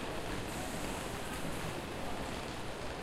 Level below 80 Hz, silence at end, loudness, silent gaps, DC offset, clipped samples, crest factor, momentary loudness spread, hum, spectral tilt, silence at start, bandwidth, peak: -50 dBFS; 0 s; -40 LUFS; none; under 0.1%; under 0.1%; 14 dB; 2 LU; none; -4 dB/octave; 0 s; 16 kHz; -24 dBFS